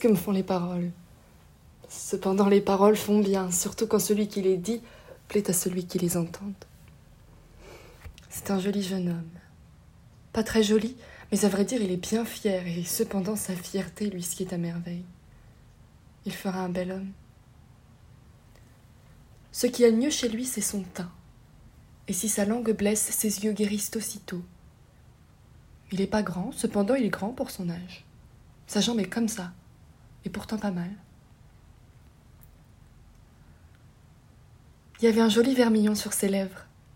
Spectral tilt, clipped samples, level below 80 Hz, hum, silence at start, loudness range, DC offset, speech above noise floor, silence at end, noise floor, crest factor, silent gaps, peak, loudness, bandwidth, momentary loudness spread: -4.5 dB/octave; under 0.1%; -56 dBFS; none; 0 s; 12 LU; under 0.1%; 28 dB; 0.3 s; -55 dBFS; 20 dB; none; -8 dBFS; -27 LUFS; 16.5 kHz; 18 LU